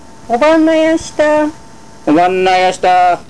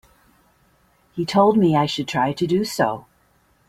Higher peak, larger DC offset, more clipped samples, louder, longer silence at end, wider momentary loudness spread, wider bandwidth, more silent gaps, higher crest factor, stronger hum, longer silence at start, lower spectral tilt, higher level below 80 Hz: about the same, -4 dBFS vs -4 dBFS; first, 2% vs under 0.1%; neither; first, -11 LUFS vs -20 LUFS; second, 0.1 s vs 0.7 s; second, 7 LU vs 12 LU; second, 11 kHz vs 15.5 kHz; neither; second, 8 dB vs 18 dB; neither; second, 0.3 s vs 1.15 s; second, -4.5 dB/octave vs -6 dB/octave; first, -44 dBFS vs -58 dBFS